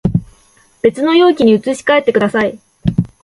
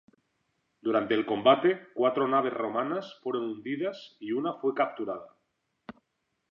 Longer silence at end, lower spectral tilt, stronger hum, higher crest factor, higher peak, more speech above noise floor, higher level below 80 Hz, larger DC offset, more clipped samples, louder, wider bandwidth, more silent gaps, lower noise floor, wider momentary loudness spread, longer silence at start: second, 0.15 s vs 0.6 s; about the same, -6.5 dB/octave vs -7 dB/octave; neither; second, 14 dB vs 22 dB; first, 0 dBFS vs -8 dBFS; second, 39 dB vs 51 dB; first, -38 dBFS vs -78 dBFS; neither; neither; first, -13 LUFS vs -29 LUFS; first, 11.5 kHz vs 6.8 kHz; neither; second, -50 dBFS vs -80 dBFS; second, 9 LU vs 12 LU; second, 0.05 s vs 0.85 s